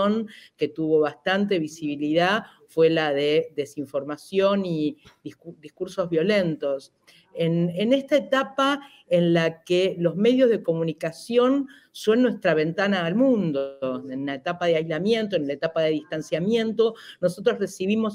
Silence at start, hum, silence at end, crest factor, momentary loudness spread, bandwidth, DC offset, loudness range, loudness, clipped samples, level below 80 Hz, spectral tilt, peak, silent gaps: 0 s; none; 0 s; 14 dB; 10 LU; 15 kHz; under 0.1%; 4 LU; -24 LUFS; under 0.1%; -70 dBFS; -6 dB/octave; -8 dBFS; none